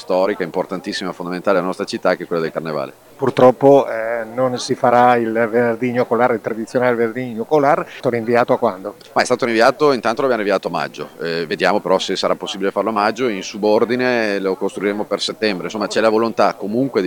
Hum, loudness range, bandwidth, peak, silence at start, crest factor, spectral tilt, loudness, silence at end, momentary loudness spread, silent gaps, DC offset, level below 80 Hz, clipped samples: none; 3 LU; 18 kHz; 0 dBFS; 0 s; 18 dB; -5 dB/octave; -17 LUFS; 0 s; 10 LU; none; under 0.1%; -62 dBFS; under 0.1%